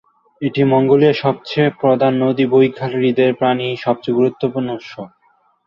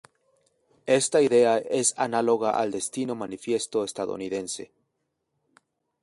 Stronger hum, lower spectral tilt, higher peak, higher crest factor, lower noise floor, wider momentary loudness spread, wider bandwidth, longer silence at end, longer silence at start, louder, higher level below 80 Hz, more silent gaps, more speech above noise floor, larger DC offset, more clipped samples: neither; first, -8.5 dB/octave vs -3.5 dB/octave; first, -2 dBFS vs -8 dBFS; about the same, 14 dB vs 18 dB; second, -58 dBFS vs -78 dBFS; about the same, 12 LU vs 12 LU; second, 6.4 kHz vs 11.5 kHz; second, 0.6 s vs 1.35 s; second, 0.4 s vs 0.85 s; first, -16 LUFS vs -25 LUFS; first, -60 dBFS vs -70 dBFS; neither; second, 43 dB vs 54 dB; neither; neither